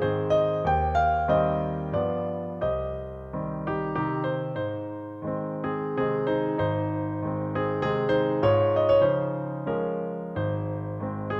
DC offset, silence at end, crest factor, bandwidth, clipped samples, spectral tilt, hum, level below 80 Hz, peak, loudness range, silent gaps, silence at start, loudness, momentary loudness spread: under 0.1%; 0 s; 16 dB; 7 kHz; under 0.1%; -9 dB/octave; none; -44 dBFS; -10 dBFS; 6 LU; none; 0 s; -27 LUFS; 10 LU